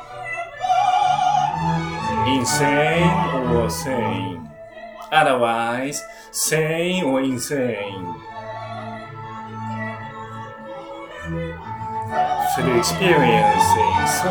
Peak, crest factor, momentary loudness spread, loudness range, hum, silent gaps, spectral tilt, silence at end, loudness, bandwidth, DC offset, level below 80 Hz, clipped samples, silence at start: -2 dBFS; 20 dB; 17 LU; 12 LU; none; none; -4.5 dB/octave; 0 s; -20 LUFS; over 20 kHz; under 0.1%; -46 dBFS; under 0.1%; 0 s